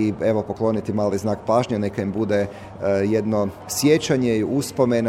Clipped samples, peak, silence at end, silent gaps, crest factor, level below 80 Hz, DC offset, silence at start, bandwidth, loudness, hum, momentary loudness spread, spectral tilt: under 0.1%; -4 dBFS; 0 s; none; 16 dB; -52 dBFS; under 0.1%; 0 s; 16.5 kHz; -22 LUFS; none; 6 LU; -6 dB/octave